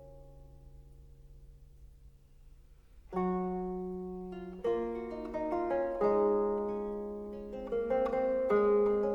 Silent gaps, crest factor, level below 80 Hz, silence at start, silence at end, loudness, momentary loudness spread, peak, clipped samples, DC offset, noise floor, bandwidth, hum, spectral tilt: none; 16 dB; -56 dBFS; 0 s; 0 s; -33 LUFS; 13 LU; -18 dBFS; under 0.1%; under 0.1%; -57 dBFS; 5.6 kHz; none; -9 dB/octave